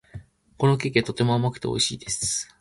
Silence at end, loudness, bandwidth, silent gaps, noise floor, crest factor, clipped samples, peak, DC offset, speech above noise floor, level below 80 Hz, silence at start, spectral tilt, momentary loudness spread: 0.15 s; -24 LUFS; 11.5 kHz; none; -44 dBFS; 20 dB; under 0.1%; -6 dBFS; under 0.1%; 20 dB; -54 dBFS; 0.15 s; -4 dB/octave; 4 LU